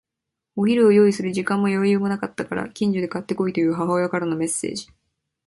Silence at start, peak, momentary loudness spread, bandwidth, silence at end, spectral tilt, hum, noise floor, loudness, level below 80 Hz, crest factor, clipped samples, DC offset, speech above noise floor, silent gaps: 0.55 s; -6 dBFS; 12 LU; 11.5 kHz; 0.65 s; -6 dB/octave; none; -84 dBFS; -21 LUFS; -62 dBFS; 16 dB; under 0.1%; under 0.1%; 63 dB; none